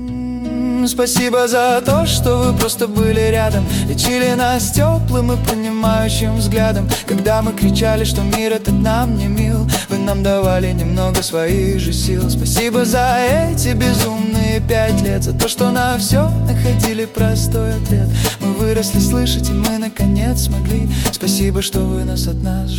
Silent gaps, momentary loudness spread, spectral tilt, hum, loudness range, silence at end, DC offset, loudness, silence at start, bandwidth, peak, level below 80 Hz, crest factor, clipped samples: none; 4 LU; -5 dB/octave; none; 2 LU; 0 s; under 0.1%; -16 LUFS; 0 s; 18 kHz; 0 dBFS; -24 dBFS; 14 dB; under 0.1%